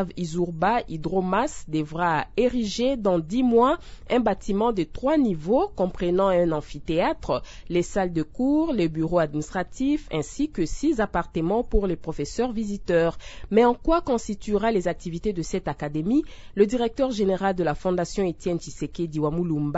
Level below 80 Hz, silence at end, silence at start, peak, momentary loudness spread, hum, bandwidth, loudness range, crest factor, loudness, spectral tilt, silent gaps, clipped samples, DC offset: -40 dBFS; 0 s; 0 s; -6 dBFS; 8 LU; none; 8 kHz; 2 LU; 18 dB; -25 LUFS; -6.5 dB/octave; none; under 0.1%; under 0.1%